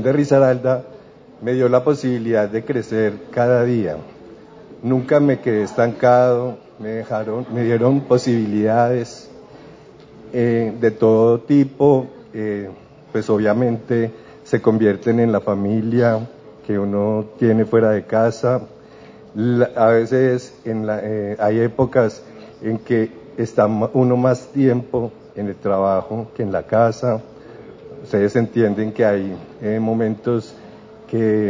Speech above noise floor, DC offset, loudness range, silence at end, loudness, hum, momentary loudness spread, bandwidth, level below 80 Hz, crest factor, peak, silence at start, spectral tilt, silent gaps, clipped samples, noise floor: 25 dB; under 0.1%; 3 LU; 0 s; -18 LUFS; none; 12 LU; 7.6 kHz; -54 dBFS; 16 dB; -2 dBFS; 0 s; -8 dB/octave; none; under 0.1%; -42 dBFS